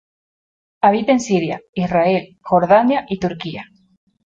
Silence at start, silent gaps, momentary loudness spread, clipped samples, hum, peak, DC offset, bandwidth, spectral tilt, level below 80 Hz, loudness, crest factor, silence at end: 0.85 s; 1.69-1.73 s; 11 LU; under 0.1%; none; -2 dBFS; under 0.1%; 8 kHz; -6 dB/octave; -54 dBFS; -17 LUFS; 16 dB; 0.6 s